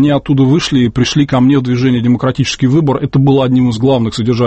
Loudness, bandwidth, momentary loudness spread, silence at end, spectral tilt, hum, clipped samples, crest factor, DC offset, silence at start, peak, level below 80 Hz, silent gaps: -11 LUFS; 8.6 kHz; 3 LU; 0 s; -6.5 dB/octave; none; under 0.1%; 10 dB; under 0.1%; 0 s; 0 dBFS; -38 dBFS; none